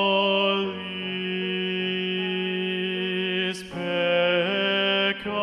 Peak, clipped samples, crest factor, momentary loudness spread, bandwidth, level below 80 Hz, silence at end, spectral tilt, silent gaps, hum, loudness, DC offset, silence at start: -10 dBFS; under 0.1%; 14 dB; 7 LU; 11.5 kHz; -66 dBFS; 0 s; -5.5 dB/octave; none; none; -24 LUFS; under 0.1%; 0 s